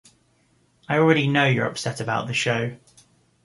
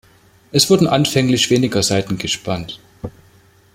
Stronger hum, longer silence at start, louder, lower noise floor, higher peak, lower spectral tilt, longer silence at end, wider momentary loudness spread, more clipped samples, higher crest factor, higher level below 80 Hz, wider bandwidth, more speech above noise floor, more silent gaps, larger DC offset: neither; first, 0.9 s vs 0.55 s; second, -22 LUFS vs -16 LUFS; first, -63 dBFS vs -50 dBFS; second, -4 dBFS vs 0 dBFS; first, -5.5 dB/octave vs -4 dB/octave; about the same, 0.7 s vs 0.65 s; second, 8 LU vs 20 LU; neither; about the same, 20 dB vs 18 dB; second, -62 dBFS vs -48 dBFS; second, 11.5 kHz vs 16.5 kHz; first, 41 dB vs 34 dB; neither; neither